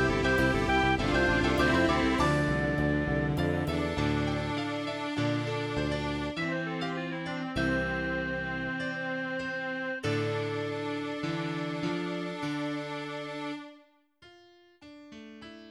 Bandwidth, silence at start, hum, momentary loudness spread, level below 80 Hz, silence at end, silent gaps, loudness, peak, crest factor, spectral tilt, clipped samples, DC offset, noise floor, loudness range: 14 kHz; 0 s; none; 10 LU; -44 dBFS; 0 s; none; -30 LUFS; -14 dBFS; 18 dB; -6 dB/octave; under 0.1%; under 0.1%; -60 dBFS; 9 LU